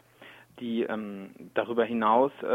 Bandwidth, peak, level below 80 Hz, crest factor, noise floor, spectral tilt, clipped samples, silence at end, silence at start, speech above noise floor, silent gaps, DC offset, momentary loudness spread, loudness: 15.5 kHz; -10 dBFS; -72 dBFS; 20 dB; -53 dBFS; -7 dB/octave; under 0.1%; 0 s; 0.2 s; 25 dB; none; under 0.1%; 16 LU; -28 LUFS